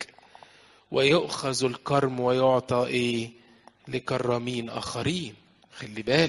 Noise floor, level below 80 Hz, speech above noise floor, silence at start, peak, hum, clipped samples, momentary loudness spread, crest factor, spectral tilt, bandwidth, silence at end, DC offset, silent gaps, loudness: -54 dBFS; -60 dBFS; 29 dB; 0 s; -4 dBFS; none; under 0.1%; 14 LU; 22 dB; -5 dB/octave; 11.5 kHz; 0 s; under 0.1%; none; -26 LUFS